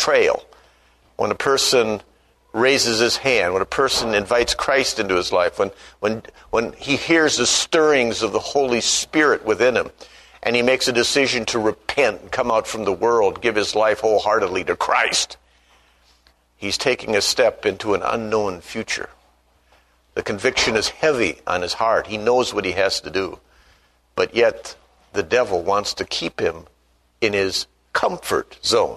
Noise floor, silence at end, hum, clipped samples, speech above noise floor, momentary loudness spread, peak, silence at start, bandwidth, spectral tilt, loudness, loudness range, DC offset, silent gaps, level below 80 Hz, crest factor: -60 dBFS; 0 s; 60 Hz at -50 dBFS; under 0.1%; 41 dB; 9 LU; -2 dBFS; 0 s; 13.5 kHz; -2.5 dB/octave; -19 LUFS; 4 LU; under 0.1%; none; -50 dBFS; 20 dB